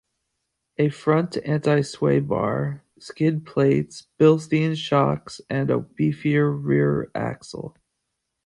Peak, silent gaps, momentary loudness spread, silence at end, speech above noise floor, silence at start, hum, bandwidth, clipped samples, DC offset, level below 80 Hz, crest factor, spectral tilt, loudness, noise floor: -4 dBFS; none; 14 LU; 0.75 s; 57 dB; 0.8 s; none; 11 kHz; under 0.1%; under 0.1%; -56 dBFS; 20 dB; -7.5 dB/octave; -22 LUFS; -79 dBFS